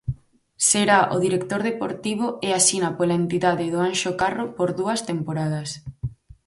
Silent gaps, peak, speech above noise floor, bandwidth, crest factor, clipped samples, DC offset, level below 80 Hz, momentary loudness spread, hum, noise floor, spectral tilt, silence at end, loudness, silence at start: none; -4 dBFS; 21 dB; 12 kHz; 18 dB; under 0.1%; under 0.1%; -50 dBFS; 15 LU; none; -43 dBFS; -3.5 dB/octave; 0.35 s; -22 LUFS; 0.05 s